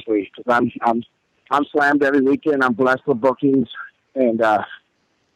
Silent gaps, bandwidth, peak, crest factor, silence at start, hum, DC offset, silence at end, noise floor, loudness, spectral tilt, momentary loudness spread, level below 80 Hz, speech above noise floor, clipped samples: none; 9.8 kHz; -6 dBFS; 14 dB; 0.05 s; none; under 0.1%; 0.6 s; -66 dBFS; -18 LUFS; -7 dB/octave; 8 LU; -64 dBFS; 48 dB; under 0.1%